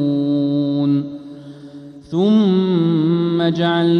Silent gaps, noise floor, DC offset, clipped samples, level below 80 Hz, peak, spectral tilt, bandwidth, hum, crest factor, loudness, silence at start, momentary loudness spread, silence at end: none; -37 dBFS; under 0.1%; under 0.1%; -62 dBFS; -4 dBFS; -8.5 dB/octave; 6.6 kHz; none; 12 dB; -17 LUFS; 0 s; 22 LU; 0 s